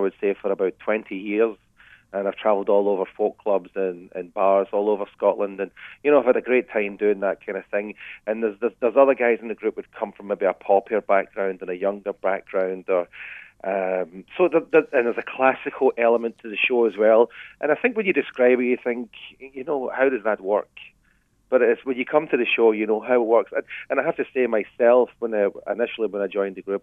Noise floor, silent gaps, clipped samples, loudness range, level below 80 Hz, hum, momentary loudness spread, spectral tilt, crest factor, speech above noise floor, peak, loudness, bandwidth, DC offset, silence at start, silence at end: -63 dBFS; none; under 0.1%; 4 LU; -68 dBFS; none; 10 LU; -7.5 dB/octave; 20 dB; 41 dB; -2 dBFS; -22 LUFS; 3.8 kHz; under 0.1%; 0 s; 0.05 s